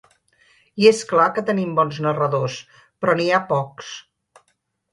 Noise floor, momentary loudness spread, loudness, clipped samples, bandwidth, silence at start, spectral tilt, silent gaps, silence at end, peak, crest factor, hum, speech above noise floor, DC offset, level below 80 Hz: -70 dBFS; 19 LU; -19 LUFS; under 0.1%; 11.5 kHz; 0.75 s; -5.5 dB/octave; none; 0.9 s; -2 dBFS; 20 dB; none; 50 dB; under 0.1%; -66 dBFS